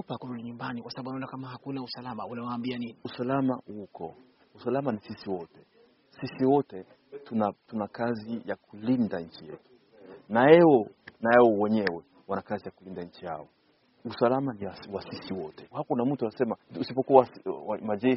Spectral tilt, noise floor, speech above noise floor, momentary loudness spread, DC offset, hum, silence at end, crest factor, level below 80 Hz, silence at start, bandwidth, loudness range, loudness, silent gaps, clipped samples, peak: -5.5 dB/octave; -66 dBFS; 38 dB; 19 LU; under 0.1%; none; 0 s; 24 dB; -70 dBFS; 0.1 s; 5.8 kHz; 10 LU; -28 LUFS; none; under 0.1%; -4 dBFS